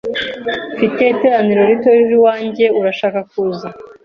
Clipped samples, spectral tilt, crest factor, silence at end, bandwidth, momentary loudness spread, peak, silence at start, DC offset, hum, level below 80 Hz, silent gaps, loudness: under 0.1%; -7 dB/octave; 12 dB; 0.2 s; 6.4 kHz; 10 LU; -2 dBFS; 0.05 s; under 0.1%; none; -56 dBFS; none; -14 LUFS